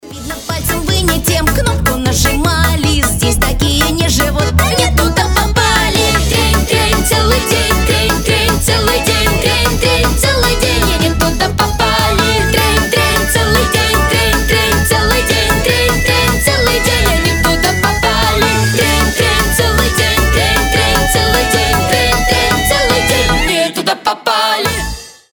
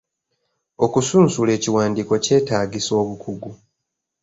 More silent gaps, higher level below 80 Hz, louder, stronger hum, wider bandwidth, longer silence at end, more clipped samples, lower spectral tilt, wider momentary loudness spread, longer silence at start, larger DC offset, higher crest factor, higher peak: neither; first, -18 dBFS vs -54 dBFS; first, -11 LUFS vs -19 LUFS; neither; first, over 20 kHz vs 8 kHz; second, 0.2 s vs 0.65 s; neither; second, -3.5 dB/octave vs -5 dB/octave; second, 2 LU vs 15 LU; second, 0.05 s vs 0.8 s; neither; second, 12 dB vs 18 dB; about the same, 0 dBFS vs -2 dBFS